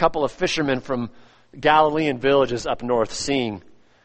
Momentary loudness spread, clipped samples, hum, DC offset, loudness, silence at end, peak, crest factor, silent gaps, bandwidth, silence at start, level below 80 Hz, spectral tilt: 11 LU; under 0.1%; none; under 0.1%; -21 LUFS; 0.45 s; -2 dBFS; 20 dB; none; 8.8 kHz; 0 s; -46 dBFS; -4.5 dB/octave